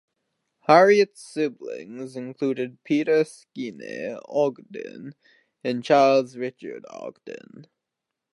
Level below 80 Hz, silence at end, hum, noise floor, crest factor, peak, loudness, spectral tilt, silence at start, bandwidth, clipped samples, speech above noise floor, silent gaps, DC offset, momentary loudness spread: -80 dBFS; 0.7 s; none; -85 dBFS; 22 dB; -2 dBFS; -22 LUFS; -5.5 dB/octave; 0.7 s; 11.5 kHz; under 0.1%; 61 dB; none; under 0.1%; 21 LU